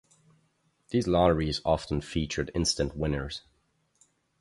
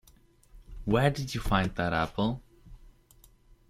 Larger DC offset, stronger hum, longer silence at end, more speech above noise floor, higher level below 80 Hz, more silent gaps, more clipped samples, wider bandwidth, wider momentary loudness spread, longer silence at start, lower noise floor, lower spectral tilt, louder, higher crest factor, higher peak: neither; neither; first, 1 s vs 0.8 s; first, 44 dB vs 32 dB; about the same, -42 dBFS vs -44 dBFS; neither; neither; second, 11.5 kHz vs 16 kHz; about the same, 9 LU vs 9 LU; first, 0.9 s vs 0.55 s; first, -72 dBFS vs -60 dBFS; about the same, -5 dB/octave vs -6 dB/octave; about the same, -28 LUFS vs -29 LUFS; about the same, 22 dB vs 22 dB; about the same, -8 dBFS vs -10 dBFS